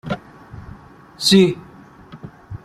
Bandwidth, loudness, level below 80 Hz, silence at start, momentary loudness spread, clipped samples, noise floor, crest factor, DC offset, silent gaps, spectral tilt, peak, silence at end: 15 kHz; -16 LUFS; -50 dBFS; 0.05 s; 26 LU; under 0.1%; -43 dBFS; 20 dB; under 0.1%; none; -5 dB/octave; -2 dBFS; 0.1 s